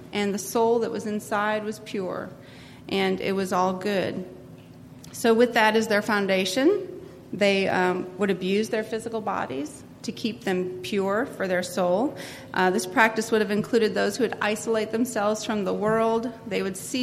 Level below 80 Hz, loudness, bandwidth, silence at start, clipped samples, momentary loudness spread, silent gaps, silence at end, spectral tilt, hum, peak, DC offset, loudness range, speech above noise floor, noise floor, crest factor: -62 dBFS; -25 LUFS; 15.5 kHz; 0 s; under 0.1%; 14 LU; none; 0 s; -4.5 dB/octave; none; -4 dBFS; under 0.1%; 5 LU; 21 dB; -45 dBFS; 20 dB